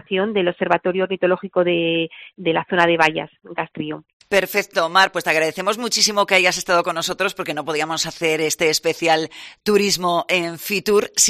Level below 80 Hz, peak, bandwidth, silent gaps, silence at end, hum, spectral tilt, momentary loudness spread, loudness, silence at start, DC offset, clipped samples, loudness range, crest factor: -60 dBFS; -2 dBFS; 15.5 kHz; 4.13-4.20 s; 0 s; none; -2.5 dB/octave; 11 LU; -19 LUFS; 0.1 s; under 0.1%; under 0.1%; 3 LU; 18 dB